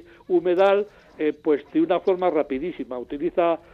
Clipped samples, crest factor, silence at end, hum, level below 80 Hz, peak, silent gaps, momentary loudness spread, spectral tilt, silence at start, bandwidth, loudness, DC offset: under 0.1%; 16 dB; 0.15 s; none; -58 dBFS; -8 dBFS; none; 11 LU; -7.5 dB/octave; 0.3 s; 5.8 kHz; -23 LUFS; under 0.1%